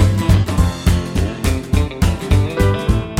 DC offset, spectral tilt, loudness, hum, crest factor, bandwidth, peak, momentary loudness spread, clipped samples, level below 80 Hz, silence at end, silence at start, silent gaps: under 0.1%; -6.5 dB/octave; -17 LUFS; none; 14 dB; 16 kHz; -2 dBFS; 4 LU; under 0.1%; -22 dBFS; 0 s; 0 s; none